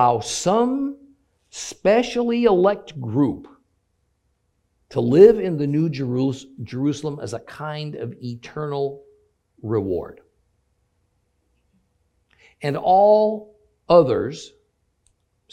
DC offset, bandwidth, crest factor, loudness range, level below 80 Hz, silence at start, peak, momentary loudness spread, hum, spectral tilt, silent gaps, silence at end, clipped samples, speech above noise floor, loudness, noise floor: under 0.1%; 12 kHz; 22 dB; 11 LU; -56 dBFS; 0 s; 0 dBFS; 18 LU; none; -6 dB/octave; none; 1.05 s; under 0.1%; 50 dB; -20 LUFS; -69 dBFS